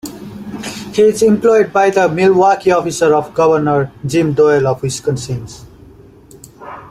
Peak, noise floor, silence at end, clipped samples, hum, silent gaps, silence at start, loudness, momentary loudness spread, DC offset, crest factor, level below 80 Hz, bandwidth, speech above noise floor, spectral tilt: 0 dBFS; -40 dBFS; 0 s; under 0.1%; none; none; 0.05 s; -13 LUFS; 16 LU; under 0.1%; 14 dB; -48 dBFS; 15.5 kHz; 28 dB; -5.5 dB/octave